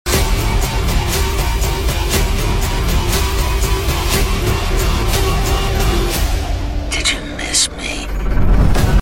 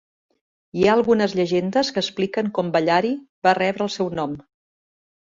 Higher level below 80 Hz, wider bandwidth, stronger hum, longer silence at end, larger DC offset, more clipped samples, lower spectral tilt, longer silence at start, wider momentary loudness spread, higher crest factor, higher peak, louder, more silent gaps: first, -18 dBFS vs -58 dBFS; first, 16.5 kHz vs 7.8 kHz; neither; second, 0 s vs 0.9 s; neither; neither; second, -4 dB/octave vs -5.5 dB/octave; second, 0.05 s vs 0.75 s; second, 5 LU vs 9 LU; about the same, 14 dB vs 18 dB; about the same, -2 dBFS vs -4 dBFS; first, -17 LUFS vs -21 LUFS; second, none vs 3.29-3.42 s